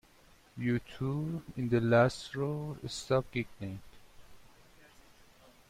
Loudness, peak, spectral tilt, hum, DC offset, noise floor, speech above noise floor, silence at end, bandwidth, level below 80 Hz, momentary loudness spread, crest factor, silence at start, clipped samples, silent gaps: -33 LUFS; -14 dBFS; -6.5 dB/octave; none; under 0.1%; -61 dBFS; 29 dB; 1.3 s; 15 kHz; -60 dBFS; 16 LU; 20 dB; 0.55 s; under 0.1%; none